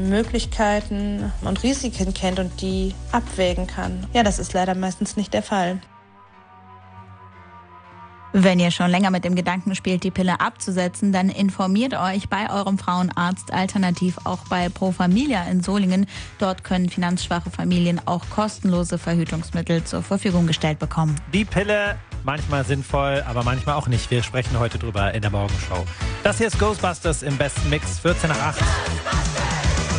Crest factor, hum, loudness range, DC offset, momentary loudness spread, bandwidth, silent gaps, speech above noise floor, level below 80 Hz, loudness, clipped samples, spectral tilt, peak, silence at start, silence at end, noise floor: 18 dB; none; 3 LU; under 0.1%; 5 LU; 10 kHz; none; 27 dB; -34 dBFS; -22 LUFS; under 0.1%; -5.5 dB/octave; -4 dBFS; 0 s; 0 s; -49 dBFS